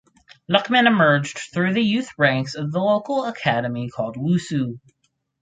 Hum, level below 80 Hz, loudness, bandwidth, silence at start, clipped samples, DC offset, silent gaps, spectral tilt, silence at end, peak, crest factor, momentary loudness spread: none; -62 dBFS; -20 LUFS; 9.4 kHz; 0.5 s; under 0.1%; under 0.1%; none; -5.5 dB/octave; 0.65 s; -2 dBFS; 20 dB; 11 LU